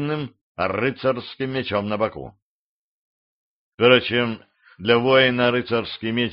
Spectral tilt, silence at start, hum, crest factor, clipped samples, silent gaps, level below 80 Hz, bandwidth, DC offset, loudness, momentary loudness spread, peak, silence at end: -3 dB/octave; 0 s; none; 22 dB; under 0.1%; 0.41-0.55 s, 2.42-3.78 s; -58 dBFS; 5.6 kHz; under 0.1%; -21 LUFS; 13 LU; 0 dBFS; 0 s